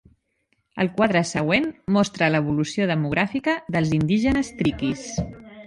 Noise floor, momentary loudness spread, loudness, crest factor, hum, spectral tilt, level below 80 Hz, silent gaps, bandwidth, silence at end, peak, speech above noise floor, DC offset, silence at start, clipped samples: -70 dBFS; 7 LU; -22 LUFS; 16 dB; none; -6 dB/octave; -46 dBFS; none; 11.5 kHz; 0 s; -6 dBFS; 49 dB; under 0.1%; 0.75 s; under 0.1%